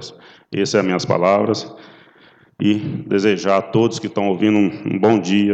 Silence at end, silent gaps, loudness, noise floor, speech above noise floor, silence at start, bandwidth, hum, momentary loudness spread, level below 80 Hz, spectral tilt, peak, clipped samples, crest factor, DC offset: 0 s; none; -18 LUFS; -50 dBFS; 33 dB; 0 s; 8.2 kHz; none; 7 LU; -62 dBFS; -6 dB/octave; -2 dBFS; under 0.1%; 16 dB; under 0.1%